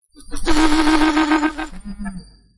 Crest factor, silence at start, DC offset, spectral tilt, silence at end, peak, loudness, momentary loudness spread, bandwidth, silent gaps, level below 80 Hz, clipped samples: 16 dB; 0.3 s; under 0.1%; -4 dB/octave; 0.35 s; -2 dBFS; -17 LUFS; 17 LU; 11.5 kHz; none; -28 dBFS; under 0.1%